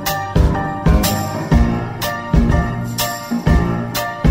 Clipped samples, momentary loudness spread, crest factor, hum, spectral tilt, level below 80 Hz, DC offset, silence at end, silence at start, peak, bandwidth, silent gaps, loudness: under 0.1%; 6 LU; 14 dB; none; -5.5 dB/octave; -20 dBFS; under 0.1%; 0 s; 0 s; -2 dBFS; 16.5 kHz; none; -17 LUFS